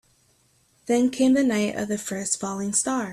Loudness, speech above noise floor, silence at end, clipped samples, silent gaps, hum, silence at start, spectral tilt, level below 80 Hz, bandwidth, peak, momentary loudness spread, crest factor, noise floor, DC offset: -23 LUFS; 40 dB; 0 s; under 0.1%; none; none; 0.85 s; -4 dB/octave; -64 dBFS; 13.5 kHz; -8 dBFS; 8 LU; 16 dB; -63 dBFS; under 0.1%